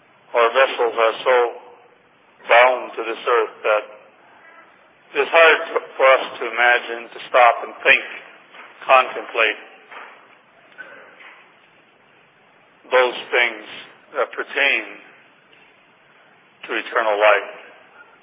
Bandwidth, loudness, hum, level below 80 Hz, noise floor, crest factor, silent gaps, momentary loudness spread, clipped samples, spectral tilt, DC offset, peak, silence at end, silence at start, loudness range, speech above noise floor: 4 kHz; -17 LUFS; none; under -90 dBFS; -54 dBFS; 20 dB; none; 22 LU; under 0.1%; -4.5 dB/octave; under 0.1%; 0 dBFS; 0.6 s; 0.35 s; 8 LU; 36 dB